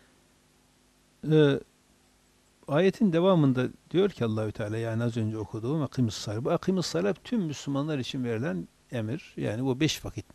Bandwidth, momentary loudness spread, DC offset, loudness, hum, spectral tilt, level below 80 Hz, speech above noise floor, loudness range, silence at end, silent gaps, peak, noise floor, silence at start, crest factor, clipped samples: 13.5 kHz; 11 LU; under 0.1%; -28 LUFS; 50 Hz at -55 dBFS; -6.5 dB/octave; -60 dBFS; 36 dB; 4 LU; 0.15 s; none; -10 dBFS; -64 dBFS; 1.25 s; 18 dB; under 0.1%